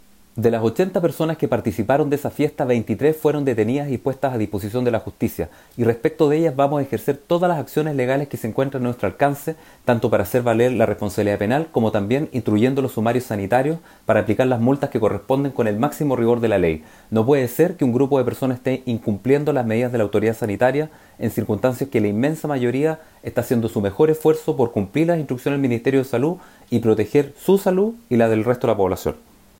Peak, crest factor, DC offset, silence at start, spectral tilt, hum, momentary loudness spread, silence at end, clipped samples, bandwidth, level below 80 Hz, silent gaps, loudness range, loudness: -4 dBFS; 14 dB; under 0.1%; 0.35 s; -7.5 dB/octave; none; 6 LU; 0.45 s; under 0.1%; 16.5 kHz; -52 dBFS; none; 2 LU; -20 LUFS